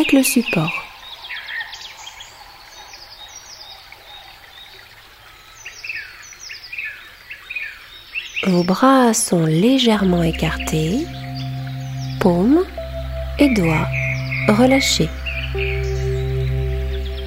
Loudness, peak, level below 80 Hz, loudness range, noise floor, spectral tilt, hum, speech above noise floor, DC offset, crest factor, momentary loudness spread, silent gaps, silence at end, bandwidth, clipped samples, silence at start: -19 LUFS; 0 dBFS; -32 dBFS; 18 LU; -43 dBFS; -5 dB/octave; none; 28 dB; under 0.1%; 18 dB; 23 LU; none; 0 s; 16 kHz; under 0.1%; 0 s